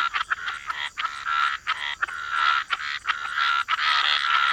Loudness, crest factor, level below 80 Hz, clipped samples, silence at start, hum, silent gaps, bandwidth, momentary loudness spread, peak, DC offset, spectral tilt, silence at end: -24 LUFS; 18 dB; -62 dBFS; under 0.1%; 0 s; none; none; 15 kHz; 9 LU; -8 dBFS; under 0.1%; 1.5 dB/octave; 0 s